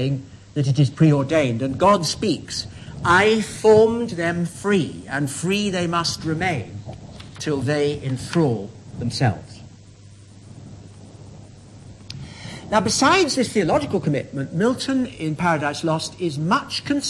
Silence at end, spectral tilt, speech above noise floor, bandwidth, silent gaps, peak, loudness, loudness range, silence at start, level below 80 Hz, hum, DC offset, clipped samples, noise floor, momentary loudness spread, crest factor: 0 s; -5 dB/octave; 25 dB; 12 kHz; none; -6 dBFS; -21 LUFS; 11 LU; 0 s; -50 dBFS; none; under 0.1%; under 0.1%; -45 dBFS; 19 LU; 16 dB